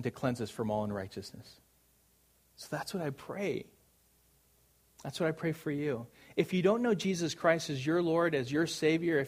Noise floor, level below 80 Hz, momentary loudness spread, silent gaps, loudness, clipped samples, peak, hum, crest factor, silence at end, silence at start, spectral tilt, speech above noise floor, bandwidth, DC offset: -69 dBFS; -68 dBFS; 13 LU; none; -33 LUFS; under 0.1%; -12 dBFS; none; 22 dB; 0 s; 0 s; -5.5 dB/octave; 36 dB; 15.5 kHz; under 0.1%